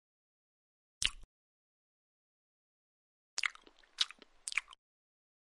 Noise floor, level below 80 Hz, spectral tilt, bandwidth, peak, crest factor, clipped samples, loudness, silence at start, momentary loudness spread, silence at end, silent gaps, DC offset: -60 dBFS; -62 dBFS; 2 dB/octave; 11.5 kHz; -10 dBFS; 34 dB; under 0.1%; -38 LUFS; 1 s; 8 LU; 0.8 s; 1.24-3.37 s; under 0.1%